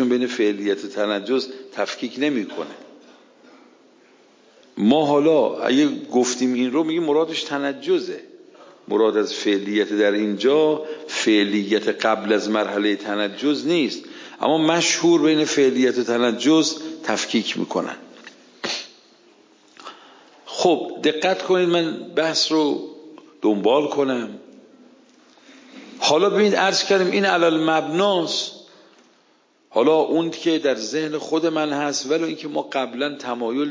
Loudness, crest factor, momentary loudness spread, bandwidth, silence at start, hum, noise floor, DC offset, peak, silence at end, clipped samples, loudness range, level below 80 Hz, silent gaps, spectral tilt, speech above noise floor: -20 LUFS; 18 dB; 10 LU; 7.6 kHz; 0 s; none; -59 dBFS; under 0.1%; -4 dBFS; 0 s; under 0.1%; 7 LU; -76 dBFS; none; -4 dB/octave; 39 dB